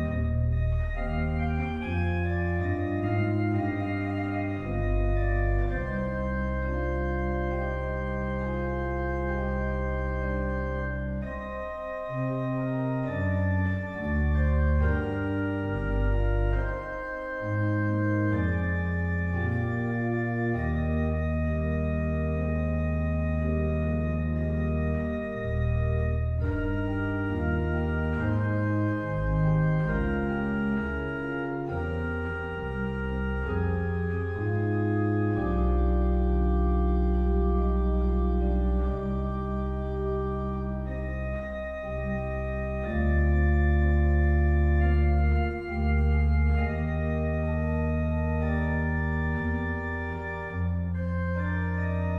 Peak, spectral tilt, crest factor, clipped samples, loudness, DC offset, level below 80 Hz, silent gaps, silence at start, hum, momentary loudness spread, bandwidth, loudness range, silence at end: -14 dBFS; -10 dB/octave; 12 dB; under 0.1%; -28 LUFS; under 0.1%; -30 dBFS; none; 0 s; none; 7 LU; 4.4 kHz; 5 LU; 0 s